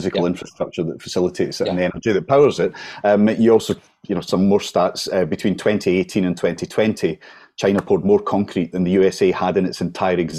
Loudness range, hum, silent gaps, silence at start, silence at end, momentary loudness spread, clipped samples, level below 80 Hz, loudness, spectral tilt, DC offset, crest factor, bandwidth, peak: 2 LU; none; none; 0 s; 0 s; 9 LU; under 0.1%; -48 dBFS; -19 LUFS; -6 dB/octave; under 0.1%; 16 dB; 14 kHz; -4 dBFS